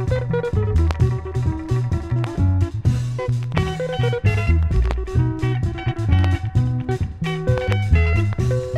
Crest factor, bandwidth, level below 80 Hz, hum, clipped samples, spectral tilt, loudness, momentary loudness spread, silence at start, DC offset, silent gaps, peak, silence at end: 16 dB; 9.4 kHz; -26 dBFS; none; under 0.1%; -7.5 dB/octave; -21 LUFS; 5 LU; 0 s; under 0.1%; none; -4 dBFS; 0 s